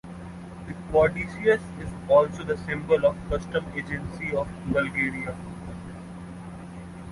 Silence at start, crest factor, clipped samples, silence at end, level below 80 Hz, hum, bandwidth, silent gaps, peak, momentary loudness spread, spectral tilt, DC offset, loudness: 0.05 s; 20 dB; under 0.1%; 0 s; -46 dBFS; none; 11.5 kHz; none; -6 dBFS; 18 LU; -7 dB/octave; under 0.1%; -26 LUFS